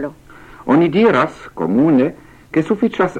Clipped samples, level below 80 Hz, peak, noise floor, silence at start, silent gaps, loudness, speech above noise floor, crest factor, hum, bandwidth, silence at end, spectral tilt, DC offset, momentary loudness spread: under 0.1%; -50 dBFS; -2 dBFS; -40 dBFS; 0 s; none; -16 LUFS; 25 dB; 14 dB; none; 9.2 kHz; 0 s; -8 dB/octave; under 0.1%; 10 LU